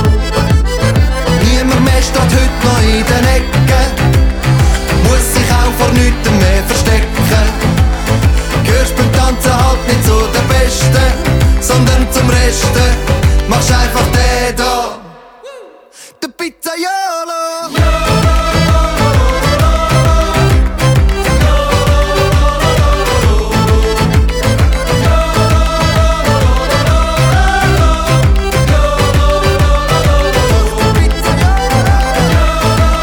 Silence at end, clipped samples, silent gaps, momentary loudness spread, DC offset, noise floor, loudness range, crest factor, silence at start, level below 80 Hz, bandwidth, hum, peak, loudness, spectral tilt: 0 s; under 0.1%; none; 2 LU; under 0.1%; -37 dBFS; 3 LU; 10 dB; 0 s; -14 dBFS; 19.5 kHz; none; 0 dBFS; -11 LUFS; -5 dB/octave